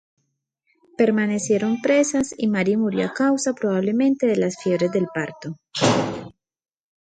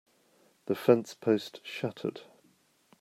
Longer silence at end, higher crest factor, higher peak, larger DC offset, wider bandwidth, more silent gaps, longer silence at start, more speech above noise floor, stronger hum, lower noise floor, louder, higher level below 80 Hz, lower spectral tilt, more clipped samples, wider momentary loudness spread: about the same, 0.75 s vs 0.8 s; second, 18 dB vs 24 dB; first, -2 dBFS vs -8 dBFS; neither; second, 9.4 kHz vs 15.5 kHz; neither; first, 1 s vs 0.7 s; first, 54 dB vs 38 dB; neither; first, -74 dBFS vs -67 dBFS; first, -21 LUFS vs -30 LUFS; first, -60 dBFS vs -78 dBFS; second, -5 dB/octave vs -6.5 dB/octave; neither; second, 10 LU vs 16 LU